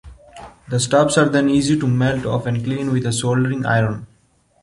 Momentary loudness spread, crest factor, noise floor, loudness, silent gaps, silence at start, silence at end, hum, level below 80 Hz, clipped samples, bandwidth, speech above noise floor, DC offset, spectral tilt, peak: 7 LU; 16 dB; -58 dBFS; -18 LUFS; none; 0.05 s; 0.6 s; none; -46 dBFS; under 0.1%; 11.5 kHz; 41 dB; under 0.1%; -5.5 dB/octave; -2 dBFS